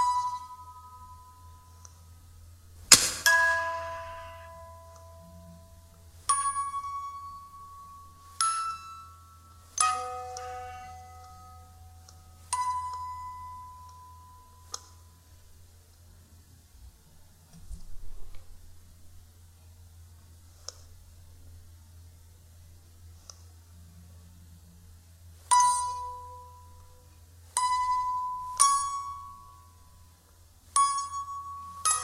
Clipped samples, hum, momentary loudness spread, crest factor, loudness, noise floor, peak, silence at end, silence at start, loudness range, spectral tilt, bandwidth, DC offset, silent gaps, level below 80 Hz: under 0.1%; none; 27 LU; 34 dB; -27 LUFS; -57 dBFS; 0 dBFS; 0 s; 0 s; 26 LU; 0.5 dB/octave; 16 kHz; under 0.1%; none; -54 dBFS